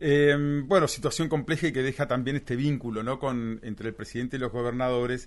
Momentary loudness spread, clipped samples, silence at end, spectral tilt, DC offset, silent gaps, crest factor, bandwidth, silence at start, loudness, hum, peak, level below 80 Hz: 11 LU; under 0.1%; 0 s; -6 dB/octave; under 0.1%; none; 20 dB; 11.5 kHz; 0 s; -27 LUFS; none; -8 dBFS; -50 dBFS